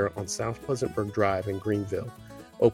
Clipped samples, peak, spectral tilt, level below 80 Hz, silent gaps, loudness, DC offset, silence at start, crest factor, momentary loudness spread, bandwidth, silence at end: under 0.1%; -8 dBFS; -5.5 dB/octave; -56 dBFS; none; -29 LUFS; under 0.1%; 0 s; 20 dB; 13 LU; 16.5 kHz; 0 s